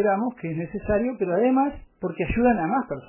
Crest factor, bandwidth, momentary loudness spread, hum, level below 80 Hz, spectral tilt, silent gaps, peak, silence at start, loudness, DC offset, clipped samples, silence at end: 16 dB; 3.1 kHz; 10 LU; none; -42 dBFS; -11.5 dB/octave; none; -8 dBFS; 0 s; -24 LUFS; under 0.1%; under 0.1%; 0.05 s